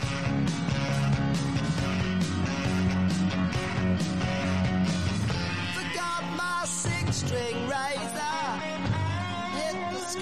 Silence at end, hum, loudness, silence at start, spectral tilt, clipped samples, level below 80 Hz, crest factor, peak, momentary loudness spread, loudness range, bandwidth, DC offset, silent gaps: 0 s; none; -28 LUFS; 0 s; -5 dB/octave; under 0.1%; -48 dBFS; 12 dB; -16 dBFS; 4 LU; 2 LU; 13 kHz; 0.4%; none